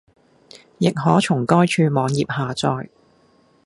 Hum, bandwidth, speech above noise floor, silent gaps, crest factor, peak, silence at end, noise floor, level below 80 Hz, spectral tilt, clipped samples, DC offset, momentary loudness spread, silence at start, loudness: none; 11.5 kHz; 39 dB; none; 20 dB; 0 dBFS; 0.8 s; -57 dBFS; -58 dBFS; -6 dB/octave; under 0.1%; under 0.1%; 7 LU; 0.8 s; -19 LUFS